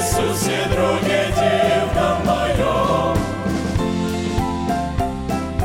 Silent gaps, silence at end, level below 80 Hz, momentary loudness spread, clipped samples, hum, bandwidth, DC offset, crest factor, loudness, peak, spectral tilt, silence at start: none; 0 s; -32 dBFS; 5 LU; under 0.1%; none; 16.5 kHz; under 0.1%; 14 dB; -19 LUFS; -6 dBFS; -5 dB/octave; 0 s